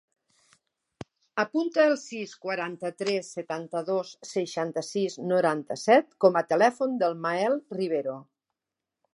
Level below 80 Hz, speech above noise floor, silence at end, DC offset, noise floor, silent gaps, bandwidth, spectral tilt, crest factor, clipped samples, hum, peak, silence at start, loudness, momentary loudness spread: -76 dBFS; 61 dB; 0.95 s; under 0.1%; -88 dBFS; none; 11.5 kHz; -5 dB/octave; 22 dB; under 0.1%; none; -6 dBFS; 1 s; -27 LUFS; 13 LU